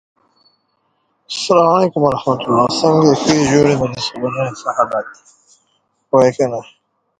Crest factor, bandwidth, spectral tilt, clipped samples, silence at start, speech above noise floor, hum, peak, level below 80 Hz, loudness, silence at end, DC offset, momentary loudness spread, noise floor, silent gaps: 16 dB; 9.4 kHz; -5.5 dB/octave; under 0.1%; 1.3 s; 50 dB; none; 0 dBFS; -50 dBFS; -15 LUFS; 0.55 s; under 0.1%; 9 LU; -65 dBFS; none